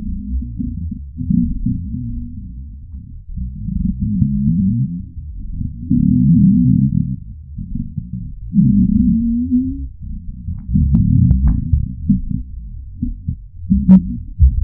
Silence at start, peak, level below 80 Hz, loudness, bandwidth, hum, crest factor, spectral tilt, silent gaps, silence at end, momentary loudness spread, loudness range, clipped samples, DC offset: 0 s; 0 dBFS; -24 dBFS; -17 LUFS; 1.4 kHz; none; 16 dB; -15.5 dB/octave; none; 0 s; 20 LU; 7 LU; under 0.1%; under 0.1%